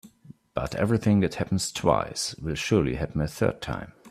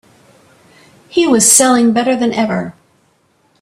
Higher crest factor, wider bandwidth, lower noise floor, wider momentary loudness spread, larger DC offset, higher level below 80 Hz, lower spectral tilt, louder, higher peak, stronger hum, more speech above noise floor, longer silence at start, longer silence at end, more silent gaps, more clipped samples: first, 22 dB vs 14 dB; second, 14.5 kHz vs 16 kHz; second, -52 dBFS vs -56 dBFS; second, 10 LU vs 13 LU; neither; first, -46 dBFS vs -56 dBFS; first, -5.5 dB/octave vs -3 dB/octave; second, -26 LUFS vs -11 LUFS; second, -6 dBFS vs 0 dBFS; neither; second, 26 dB vs 45 dB; second, 0.05 s vs 1.15 s; second, 0 s vs 0.9 s; neither; neither